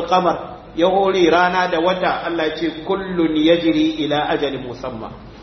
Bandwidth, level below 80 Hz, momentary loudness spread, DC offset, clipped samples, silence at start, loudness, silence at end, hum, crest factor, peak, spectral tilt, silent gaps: 6.4 kHz; -46 dBFS; 14 LU; under 0.1%; under 0.1%; 0 s; -18 LUFS; 0 s; none; 16 dB; -2 dBFS; -6 dB/octave; none